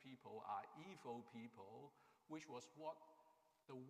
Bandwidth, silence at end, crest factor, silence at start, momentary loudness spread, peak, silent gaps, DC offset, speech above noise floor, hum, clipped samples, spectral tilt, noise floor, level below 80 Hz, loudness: 14.5 kHz; 0 s; 20 dB; 0 s; 10 LU; -38 dBFS; none; under 0.1%; 20 dB; none; under 0.1%; -5.5 dB/octave; -76 dBFS; under -90 dBFS; -56 LUFS